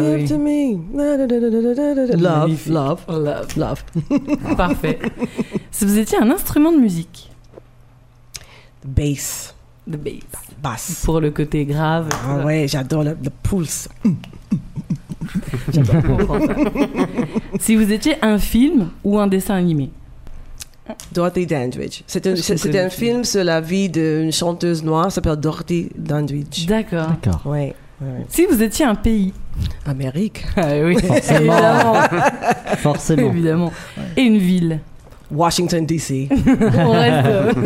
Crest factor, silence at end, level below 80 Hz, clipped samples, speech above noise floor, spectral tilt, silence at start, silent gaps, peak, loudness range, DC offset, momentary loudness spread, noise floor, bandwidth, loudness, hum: 18 dB; 0 s; -34 dBFS; under 0.1%; 29 dB; -6 dB/octave; 0 s; none; 0 dBFS; 6 LU; under 0.1%; 13 LU; -46 dBFS; 16 kHz; -18 LUFS; none